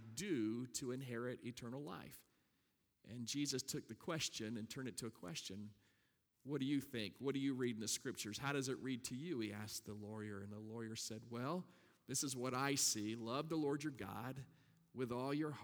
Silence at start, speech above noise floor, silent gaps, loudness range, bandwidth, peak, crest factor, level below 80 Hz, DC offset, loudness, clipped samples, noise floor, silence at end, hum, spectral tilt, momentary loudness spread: 0 s; 38 dB; none; 5 LU; over 20 kHz; -24 dBFS; 20 dB; -80 dBFS; under 0.1%; -44 LUFS; under 0.1%; -83 dBFS; 0 s; none; -4 dB/octave; 10 LU